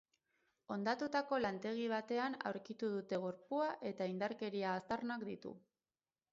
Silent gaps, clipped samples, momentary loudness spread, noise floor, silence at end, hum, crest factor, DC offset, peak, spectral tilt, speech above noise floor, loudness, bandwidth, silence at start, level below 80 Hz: none; under 0.1%; 7 LU; under -90 dBFS; 0.75 s; none; 18 dB; under 0.1%; -22 dBFS; -4 dB/octave; over 49 dB; -41 LUFS; 7.6 kHz; 0.7 s; -80 dBFS